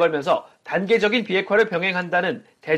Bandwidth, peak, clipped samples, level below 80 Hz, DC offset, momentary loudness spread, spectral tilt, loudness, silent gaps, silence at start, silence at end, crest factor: 10.5 kHz; -6 dBFS; under 0.1%; -66 dBFS; under 0.1%; 8 LU; -5.5 dB/octave; -21 LUFS; none; 0 s; 0 s; 16 dB